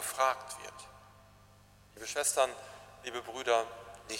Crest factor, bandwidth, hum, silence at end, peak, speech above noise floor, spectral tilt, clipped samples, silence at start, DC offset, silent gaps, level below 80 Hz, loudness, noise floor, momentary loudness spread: 22 dB; 16 kHz; 50 Hz at -65 dBFS; 0 s; -14 dBFS; 26 dB; -1 dB/octave; under 0.1%; 0 s; under 0.1%; none; -68 dBFS; -34 LUFS; -60 dBFS; 19 LU